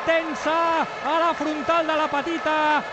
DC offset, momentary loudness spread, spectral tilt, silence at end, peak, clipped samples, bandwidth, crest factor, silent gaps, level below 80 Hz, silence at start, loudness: under 0.1%; 3 LU; -3.5 dB/octave; 0 s; -10 dBFS; under 0.1%; 8.4 kHz; 14 dB; none; -60 dBFS; 0 s; -22 LUFS